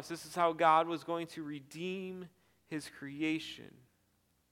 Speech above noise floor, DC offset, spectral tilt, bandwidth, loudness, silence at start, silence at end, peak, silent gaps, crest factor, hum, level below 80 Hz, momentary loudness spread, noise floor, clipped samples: 40 dB; under 0.1%; -5 dB/octave; 16.5 kHz; -35 LUFS; 0 s; 0.85 s; -14 dBFS; none; 22 dB; none; -78 dBFS; 18 LU; -75 dBFS; under 0.1%